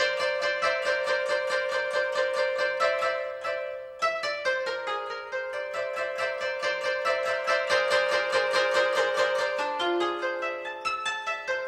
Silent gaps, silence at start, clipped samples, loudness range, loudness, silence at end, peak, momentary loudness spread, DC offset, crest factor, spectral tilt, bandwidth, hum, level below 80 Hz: none; 0 s; under 0.1%; 5 LU; -27 LUFS; 0 s; -10 dBFS; 8 LU; under 0.1%; 16 dB; -1.5 dB/octave; 13 kHz; none; -70 dBFS